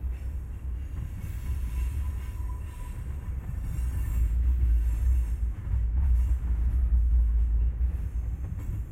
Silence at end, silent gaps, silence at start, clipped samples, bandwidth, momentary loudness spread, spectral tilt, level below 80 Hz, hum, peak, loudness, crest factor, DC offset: 0 s; none; 0 s; under 0.1%; 12 kHz; 11 LU; -7.5 dB/octave; -28 dBFS; none; -14 dBFS; -30 LUFS; 12 dB; under 0.1%